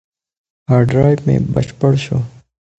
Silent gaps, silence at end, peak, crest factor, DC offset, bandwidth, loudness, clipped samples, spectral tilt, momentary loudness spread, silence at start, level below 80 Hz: none; 0.5 s; 0 dBFS; 16 dB; under 0.1%; 8.2 kHz; -15 LUFS; under 0.1%; -8.5 dB/octave; 10 LU; 0.7 s; -40 dBFS